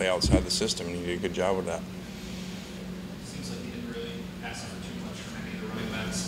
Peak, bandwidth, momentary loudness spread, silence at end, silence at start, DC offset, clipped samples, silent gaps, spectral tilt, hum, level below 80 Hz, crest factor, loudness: -10 dBFS; 16 kHz; 14 LU; 0 s; 0 s; under 0.1%; under 0.1%; none; -4.5 dB/octave; none; -42 dBFS; 22 dB; -32 LUFS